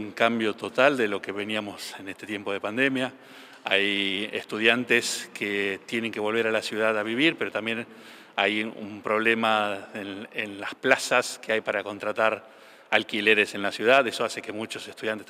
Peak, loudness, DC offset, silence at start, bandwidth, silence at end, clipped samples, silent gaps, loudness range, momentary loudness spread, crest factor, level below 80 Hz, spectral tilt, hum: -4 dBFS; -25 LUFS; under 0.1%; 0 s; 16 kHz; 0.05 s; under 0.1%; none; 3 LU; 13 LU; 24 dB; -82 dBFS; -3 dB/octave; none